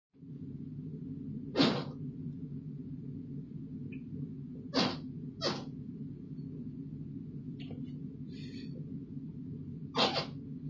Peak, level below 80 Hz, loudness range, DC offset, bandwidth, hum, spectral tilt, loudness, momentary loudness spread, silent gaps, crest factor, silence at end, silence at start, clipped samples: -14 dBFS; -62 dBFS; 6 LU; under 0.1%; 7.6 kHz; none; -5.5 dB/octave; -39 LUFS; 14 LU; none; 24 dB; 0 s; 0.15 s; under 0.1%